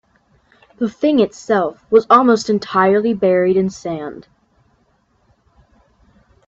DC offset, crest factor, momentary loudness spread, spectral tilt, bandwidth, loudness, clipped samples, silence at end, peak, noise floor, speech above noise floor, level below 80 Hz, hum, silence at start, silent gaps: under 0.1%; 18 dB; 13 LU; -6 dB/octave; 8 kHz; -16 LUFS; under 0.1%; 2.25 s; 0 dBFS; -60 dBFS; 45 dB; -58 dBFS; none; 0.8 s; none